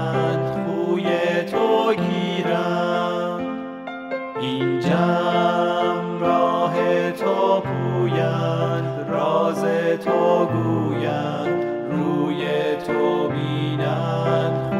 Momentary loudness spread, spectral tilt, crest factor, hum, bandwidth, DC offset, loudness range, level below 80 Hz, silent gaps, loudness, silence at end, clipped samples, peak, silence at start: 5 LU; -7.5 dB/octave; 14 dB; none; 13 kHz; under 0.1%; 2 LU; -60 dBFS; none; -21 LUFS; 0 s; under 0.1%; -6 dBFS; 0 s